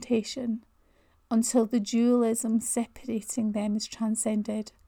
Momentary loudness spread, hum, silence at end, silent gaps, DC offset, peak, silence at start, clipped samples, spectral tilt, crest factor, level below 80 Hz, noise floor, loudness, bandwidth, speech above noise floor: 9 LU; none; 0.2 s; none; under 0.1%; -12 dBFS; 0 s; under 0.1%; -4.5 dB/octave; 16 dB; -62 dBFS; -64 dBFS; -28 LUFS; 17.5 kHz; 37 dB